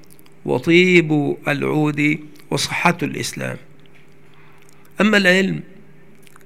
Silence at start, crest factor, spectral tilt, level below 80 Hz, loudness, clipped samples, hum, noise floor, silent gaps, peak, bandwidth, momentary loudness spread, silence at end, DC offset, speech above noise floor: 0.45 s; 20 dB; -5 dB/octave; -58 dBFS; -17 LUFS; under 0.1%; none; -49 dBFS; none; 0 dBFS; 16 kHz; 15 LU; 0.85 s; 0.9%; 32 dB